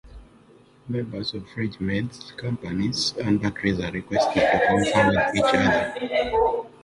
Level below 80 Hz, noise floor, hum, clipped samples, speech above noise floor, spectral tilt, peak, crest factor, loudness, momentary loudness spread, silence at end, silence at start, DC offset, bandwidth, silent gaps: -46 dBFS; -53 dBFS; none; under 0.1%; 30 dB; -5 dB/octave; -6 dBFS; 18 dB; -23 LUFS; 12 LU; 0.15 s; 0.05 s; under 0.1%; 11.5 kHz; none